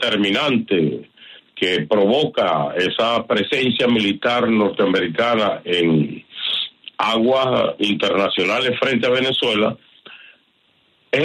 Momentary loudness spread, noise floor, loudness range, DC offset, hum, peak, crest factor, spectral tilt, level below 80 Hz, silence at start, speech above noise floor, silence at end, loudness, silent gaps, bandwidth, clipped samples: 6 LU; -60 dBFS; 1 LU; under 0.1%; none; -4 dBFS; 14 dB; -5.5 dB/octave; -60 dBFS; 0 s; 42 dB; 0 s; -18 LUFS; none; 11.5 kHz; under 0.1%